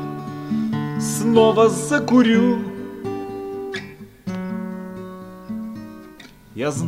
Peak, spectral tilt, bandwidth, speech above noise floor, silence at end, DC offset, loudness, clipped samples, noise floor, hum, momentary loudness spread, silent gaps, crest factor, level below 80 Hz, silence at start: -2 dBFS; -5.5 dB/octave; 15 kHz; 27 dB; 0 s; under 0.1%; -20 LUFS; under 0.1%; -43 dBFS; none; 21 LU; none; 20 dB; -56 dBFS; 0 s